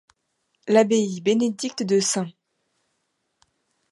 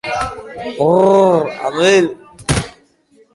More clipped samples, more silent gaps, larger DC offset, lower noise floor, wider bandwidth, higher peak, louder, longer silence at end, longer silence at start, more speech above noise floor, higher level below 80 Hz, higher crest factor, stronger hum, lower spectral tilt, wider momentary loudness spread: neither; neither; neither; first, -74 dBFS vs -52 dBFS; about the same, 11.5 kHz vs 11.5 kHz; second, -6 dBFS vs 0 dBFS; second, -22 LUFS vs -14 LUFS; first, 1.6 s vs 0.65 s; first, 0.65 s vs 0.05 s; first, 54 dB vs 39 dB; second, -74 dBFS vs -38 dBFS; first, 20 dB vs 14 dB; neither; about the same, -4 dB/octave vs -5 dB/octave; second, 11 LU vs 16 LU